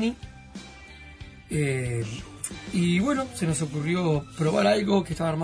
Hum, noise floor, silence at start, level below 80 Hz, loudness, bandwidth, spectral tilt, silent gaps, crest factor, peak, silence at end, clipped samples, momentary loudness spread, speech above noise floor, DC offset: none; -45 dBFS; 0 s; -50 dBFS; -26 LUFS; 11 kHz; -5.5 dB/octave; none; 18 dB; -8 dBFS; 0 s; under 0.1%; 21 LU; 20 dB; under 0.1%